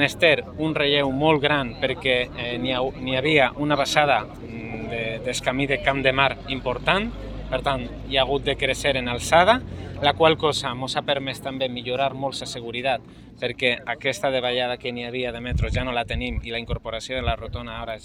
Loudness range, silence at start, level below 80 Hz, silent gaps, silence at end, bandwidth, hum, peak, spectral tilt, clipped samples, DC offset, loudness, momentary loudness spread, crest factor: 5 LU; 0 s; -40 dBFS; none; 0 s; 16.5 kHz; none; -2 dBFS; -4.5 dB/octave; under 0.1%; under 0.1%; -23 LUFS; 11 LU; 22 dB